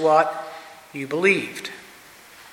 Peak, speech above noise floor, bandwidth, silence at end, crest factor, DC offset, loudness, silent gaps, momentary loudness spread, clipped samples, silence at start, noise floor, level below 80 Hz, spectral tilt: -4 dBFS; 26 dB; 17 kHz; 0.05 s; 20 dB; under 0.1%; -22 LUFS; none; 22 LU; under 0.1%; 0 s; -47 dBFS; -72 dBFS; -4.5 dB/octave